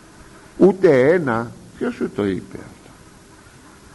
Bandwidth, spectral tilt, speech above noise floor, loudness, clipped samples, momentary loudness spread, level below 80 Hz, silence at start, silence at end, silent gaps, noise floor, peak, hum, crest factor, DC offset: 11.5 kHz; -7.5 dB/octave; 28 dB; -18 LUFS; under 0.1%; 22 LU; -52 dBFS; 0.55 s; 1.25 s; none; -45 dBFS; -2 dBFS; none; 18 dB; under 0.1%